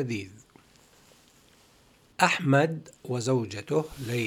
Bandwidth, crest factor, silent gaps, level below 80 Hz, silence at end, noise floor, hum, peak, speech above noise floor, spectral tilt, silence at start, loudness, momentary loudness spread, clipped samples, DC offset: 16.5 kHz; 24 dB; none; -62 dBFS; 0 s; -60 dBFS; none; -4 dBFS; 33 dB; -5.5 dB/octave; 0 s; -27 LUFS; 15 LU; under 0.1%; under 0.1%